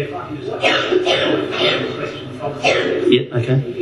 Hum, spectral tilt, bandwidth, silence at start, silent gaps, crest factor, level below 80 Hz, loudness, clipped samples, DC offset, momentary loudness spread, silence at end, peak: none; -5.5 dB/octave; 11.5 kHz; 0 s; none; 18 dB; -54 dBFS; -18 LUFS; under 0.1%; under 0.1%; 11 LU; 0 s; 0 dBFS